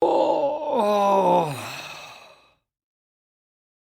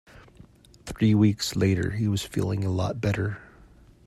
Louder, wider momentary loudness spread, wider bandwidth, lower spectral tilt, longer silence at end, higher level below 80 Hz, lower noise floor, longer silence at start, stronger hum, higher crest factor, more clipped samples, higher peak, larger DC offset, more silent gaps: first, -21 LUFS vs -25 LUFS; first, 18 LU vs 13 LU; first, 16.5 kHz vs 13.5 kHz; about the same, -5.5 dB/octave vs -6.5 dB/octave; first, 1.7 s vs 0.6 s; second, -68 dBFS vs -50 dBFS; about the same, -56 dBFS vs -53 dBFS; second, 0 s vs 0.85 s; neither; about the same, 18 dB vs 18 dB; neither; about the same, -8 dBFS vs -8 dBFS; neither; neither